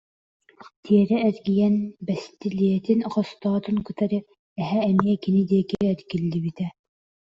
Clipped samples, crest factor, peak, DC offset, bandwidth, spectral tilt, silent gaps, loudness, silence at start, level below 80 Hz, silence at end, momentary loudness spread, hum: under 0.1%; 20 dB; -4 dBFS; under 0.1%; 7.2 kHz; -9 dB/octave; 0.76-0.83 s, 4.39-4.56 s; -24 LUFS; 0.65 s; -60 dBFS; 0.65 s; 9 LU; none